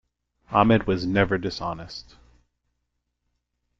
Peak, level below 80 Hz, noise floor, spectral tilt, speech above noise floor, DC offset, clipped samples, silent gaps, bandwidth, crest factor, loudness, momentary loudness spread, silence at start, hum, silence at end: -4 dBFS; -48 dBFS; -78 dBFS; -7 dB/octave; 55 dB; under 0.1%; under 0.1%; none; 7.6 kHz; 22 dB; -23 LUFS; 17 LU; 0.5 s; 60 Hz at -55 dBFS; 1.8 s